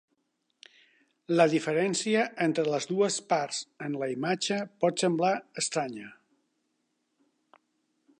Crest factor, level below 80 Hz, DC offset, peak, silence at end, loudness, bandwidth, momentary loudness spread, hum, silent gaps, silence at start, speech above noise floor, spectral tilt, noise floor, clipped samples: 20 dB; -82 dBFS; under 0.1%; -10 dBFS; 2.05 s; -28 LUFS; 11 kHz; 10 LU; none; none; 1.3 s; 49 dB; -4 dB/octave; -77 dBFS; under 0.1%